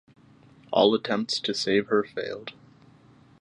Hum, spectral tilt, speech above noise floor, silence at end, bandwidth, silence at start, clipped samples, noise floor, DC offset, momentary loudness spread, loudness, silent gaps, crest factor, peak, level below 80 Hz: none; -4 dB/octave; 30 dB; 0.9 s; 10.5 kHz; 0.7 s; under 0.1%; -55 dBFS; under 0.1%; 13 LU; -25 LUFS; none; 22 dB; -6 dBFS; -68 dBFS